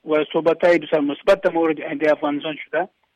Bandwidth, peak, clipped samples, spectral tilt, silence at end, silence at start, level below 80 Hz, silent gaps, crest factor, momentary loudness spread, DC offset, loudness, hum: 11 kHz; -8 dBFS; under 0.1%; -6 dB/octave; 0.3 s; 0.05 s; -60 dBFS; none; 12 dB; 8 LU; under 0.1%; -20 LUFS; none